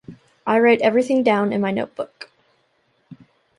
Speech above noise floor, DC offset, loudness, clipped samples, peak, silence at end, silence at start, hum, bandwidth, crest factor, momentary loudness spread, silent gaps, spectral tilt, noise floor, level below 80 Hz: 47 dB; under 0.1%; -19 LUFS; under 0.1%; -2 dBFS; 0.45 s; 0.1 s; none; 11.5 kHz; 18 dB; 17 LU; none; -6.5 dB/octave; -65 dBFS; -66 dBFS